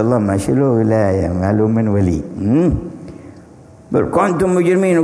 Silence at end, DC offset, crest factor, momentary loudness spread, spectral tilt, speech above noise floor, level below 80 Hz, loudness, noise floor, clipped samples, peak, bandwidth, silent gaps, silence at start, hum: 0 s; under 0.1%; 14 dB; 7 LU; -8 dB/octave; 26 dB; -36 dBFS; -15 LUFS; -41 dBFS; under 0.1%; 0 dBFS; 11 kHz; none; 0 s; none